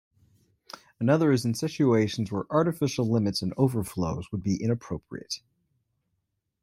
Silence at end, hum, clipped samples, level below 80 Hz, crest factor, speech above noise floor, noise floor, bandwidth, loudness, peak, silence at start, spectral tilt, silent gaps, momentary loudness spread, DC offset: 1.25 s; none; under 0.1%; -58 dBFS; 18 dB; 53 dB; -79 dBFS; 16 kHz; -27 LUFS; -10 dBFS; 1 s; -6.5 dB/octave; none; 14 LU; under 0.1%